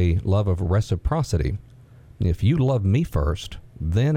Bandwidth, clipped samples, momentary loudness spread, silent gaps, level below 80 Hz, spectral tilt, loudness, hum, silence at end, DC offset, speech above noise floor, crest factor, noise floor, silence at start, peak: 13 kHz; under 0.1%; 10 LU; none; -34 dBFS; -7.5 dB/octave; -23 LUFS; none; 0 s; under 0.1%; 26 dB; 14 dB; -47 dBFS; 0 s; -8 dBFS